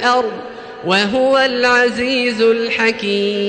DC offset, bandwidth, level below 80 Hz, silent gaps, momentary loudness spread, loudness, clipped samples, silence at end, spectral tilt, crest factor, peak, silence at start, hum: under 0.1%; 9 kHz; -54 dBFS; none; 11 LU; -15 LUFS; under 0.1%; 0 s; -4 dB/octave; 12 dB; -2 dBFS; 0 s; none